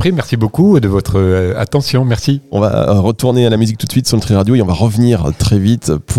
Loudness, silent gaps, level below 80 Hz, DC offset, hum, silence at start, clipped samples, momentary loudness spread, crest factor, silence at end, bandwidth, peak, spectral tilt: -12 LUFS; none; -32 dBFS; 1%; none; 0 s; under 0.1%; 4 LU; 12 dB; 0 s; 15 kHz; 0 dBFS; -6.5 dB/octave